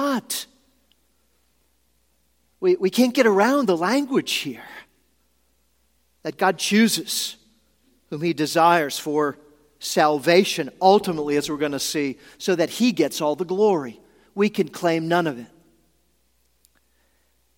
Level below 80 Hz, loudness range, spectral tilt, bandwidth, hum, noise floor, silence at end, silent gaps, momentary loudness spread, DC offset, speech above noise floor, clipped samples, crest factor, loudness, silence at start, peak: -66 dBFS; 4 LU; -4 dB/octave; 17 kHz; none; -66 dBFS; 2.1 s; none; 12 LU; under 0.1%; 46 dB; under 0.1%; 20 dB; -21 LUFS; 0 s; -2 dBFS